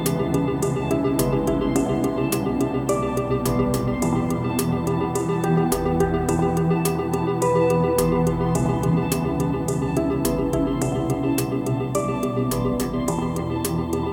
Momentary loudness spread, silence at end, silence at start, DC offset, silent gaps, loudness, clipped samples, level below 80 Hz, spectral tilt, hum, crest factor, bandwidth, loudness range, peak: 4 LU; 0 s; 0 s; under 0.1%; none; -22 LUFS; under 0.1%; -38 dBFS; -6.5 dB/octave; none; 16 dB; 17.5 kHz; 2 LU; -6 dBFS